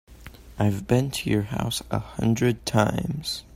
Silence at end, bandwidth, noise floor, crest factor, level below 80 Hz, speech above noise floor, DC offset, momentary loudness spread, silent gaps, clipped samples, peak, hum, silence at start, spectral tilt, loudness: 0 s; 16 kHz; -45 dBFS; 20 dB; -46 dBFS; 21 dB; under 0.1%; 6 LU; none; under 0.1%; -6 dBFS; none; 0.1 s; -5.5 dB/octave; -25 LUFS